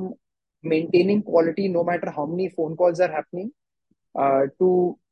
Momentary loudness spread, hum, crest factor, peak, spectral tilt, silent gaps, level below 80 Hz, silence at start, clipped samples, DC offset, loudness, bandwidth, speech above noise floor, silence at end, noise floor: 14 LU; none; 18 dB; -6 dBFS; -8 dB/octave; none; -70 dBFS; 0 s; under 0.1%; under 0.1%; -22 LUFS; 7 kHz; 51 dB; 0.15 s; -73 dBFS